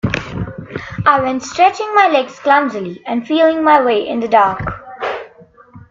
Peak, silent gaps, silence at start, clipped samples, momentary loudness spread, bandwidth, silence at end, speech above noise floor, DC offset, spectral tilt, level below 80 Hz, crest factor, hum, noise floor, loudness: 0 dBFS; none; 0.05 s; under 0.1%; 14 LU; 7.8 kHz; 0.1 s; 30 dB; under 0.1%; -5.5 dB/octave; -42 dBFS; 16 dB; none; -43 dBFS; -14 LUFS